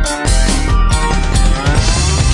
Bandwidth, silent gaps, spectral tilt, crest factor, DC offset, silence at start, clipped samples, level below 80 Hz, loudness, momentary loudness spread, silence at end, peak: 11.5 kHz; none; -4 dB/octave; 12 dB; under 0.1%; 0 s; under 0.1%; -14 dBFS; -14 LUFS; 2 LU; 0 s; 0 dBFS